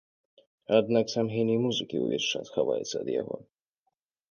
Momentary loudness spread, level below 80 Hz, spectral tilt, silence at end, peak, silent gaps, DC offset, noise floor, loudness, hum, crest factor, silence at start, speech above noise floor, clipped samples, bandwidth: 8 LU; -72 dBFS; -5 dB/octave; 0.9 s; -10 dBFS; none; under 0.1%; -81 dBFS; -28 LUFS; none; 20 dB; 0.7 s; 53 dB; under 0.1%; 7.2 kHz